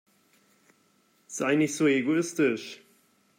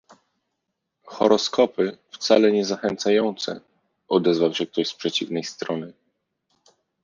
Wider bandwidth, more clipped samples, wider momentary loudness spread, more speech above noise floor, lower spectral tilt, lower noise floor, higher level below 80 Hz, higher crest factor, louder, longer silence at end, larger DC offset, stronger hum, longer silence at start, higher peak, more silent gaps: first, 16 kHz vs 7.4 kHz; neither; first, 17 LU vs 12 LU; second, 41 dB vs 58 dB; about the same, -4.5 dB/octave vs -4.5 dB/octave; second, -66 dBFS vs -79 dBFS; second, -80 dBFS vs -68 dBFS; about the same, 16 dB vs 20 dB; second, -26 LUFS vs -22 LUFS; second, 0.65 s vs 1.15 s; neither; neither; first, 1.3 s vs 1.05 s; second, -12 dBFS vs -2 dBFS; neither